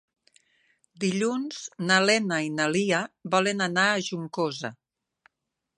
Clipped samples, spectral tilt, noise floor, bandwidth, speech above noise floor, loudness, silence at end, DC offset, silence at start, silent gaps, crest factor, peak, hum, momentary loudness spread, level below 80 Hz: under 0.1%; -4 dB/octave; -84 dBFS; 11 kHz; 58 dB; -25 LUFS; 1.05 s; under 0.1%; 1 s; none; 22 dB; -6 dBFS; none; 10 LU; -76 dBFS